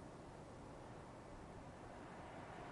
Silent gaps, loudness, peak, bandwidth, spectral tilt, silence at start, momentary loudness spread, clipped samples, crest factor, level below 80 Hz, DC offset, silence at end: none; -56 LUFS; -42 dBFS; 11 kHz; -6 dB/octave; 0 s; 3 LU; under 0.1%; 14 dB; -66 dBFS; under 0.1%; 0 s